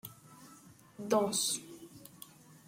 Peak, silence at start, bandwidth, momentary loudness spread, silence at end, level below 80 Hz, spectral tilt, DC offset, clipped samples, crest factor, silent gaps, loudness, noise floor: -16 dBFS; 0.05 s; 16.5 kHz; 25 LU; 0.15 s; -78 dBFS; -2.5 dB/octave; under 0.1%; under 0.1%; 22 dB; none; -32 LUFS; -58 dBFS